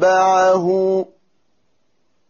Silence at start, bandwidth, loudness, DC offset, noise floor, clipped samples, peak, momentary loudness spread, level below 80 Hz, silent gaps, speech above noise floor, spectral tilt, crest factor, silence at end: 0 s; 7.2 kHz; -16 LUFS; under 0.1%; -68 dBFS; under 0.1%; -6 dBFS; 9 LU; -62 dBFS; none; 54 dB; -4 dB/octave; 12 dB; 1.25 s